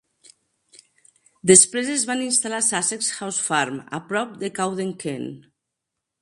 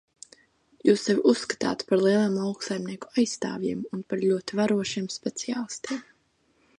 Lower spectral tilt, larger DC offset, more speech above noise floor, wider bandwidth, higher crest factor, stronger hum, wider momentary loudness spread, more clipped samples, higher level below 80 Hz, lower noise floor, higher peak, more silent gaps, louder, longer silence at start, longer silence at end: second, -2.5 dB/octave vs -5 dB/octave; neither; first, 60 dB vs 42 dB; about the same, 11.5 kHz vs 11 kHz; first, 24 dB vs 18 dB; neither; first, 17 LU vs 10 LU; neither; about the same, -66 dBFS vs -68 dBFS; first, -82 dBFS vs -67 dBFS; first, 0 dBFS vs -8 dBFS; neither; first, -20 LUFS vs -26 LUFS; first, 1.45 s vs 0.85 s; about the same, 0.85 s vs 0.75 s